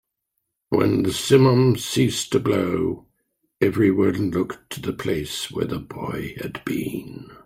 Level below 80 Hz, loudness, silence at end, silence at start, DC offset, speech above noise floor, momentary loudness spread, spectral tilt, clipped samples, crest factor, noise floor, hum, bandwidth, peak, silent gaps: -52 dBFS; -22 LUFS; 0.1 s; 0.7 s; under 0.1%; 57 dB; 14 LU; -6 dB/octave; under 0.1%; 20 dB; -78 dBFS; none; 16 kHz; -2 dBFS; none